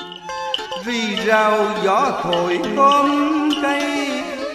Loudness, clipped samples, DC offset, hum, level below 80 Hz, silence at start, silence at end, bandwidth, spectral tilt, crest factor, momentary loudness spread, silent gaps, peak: -18 LUFS; under 0.1%; under 0.1%; none; -56 dBFS; 0 s; 0 s; 15 kHz; -4 dB/octave; 16 dB; 9 LU; none; -4 dBFS